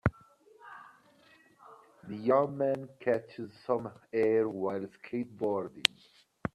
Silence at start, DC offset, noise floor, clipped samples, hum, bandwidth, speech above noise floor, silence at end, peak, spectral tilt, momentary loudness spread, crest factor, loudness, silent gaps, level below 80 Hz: 0.05 s; under 0.1%; -62 dBFS; under 0.1%; none; 13 kHz; 31 dB; 0.05 s; 0 dBFS; -5 dB/octave; 19 LU; 32 dB; -32 LUFS; none; -60 dBFS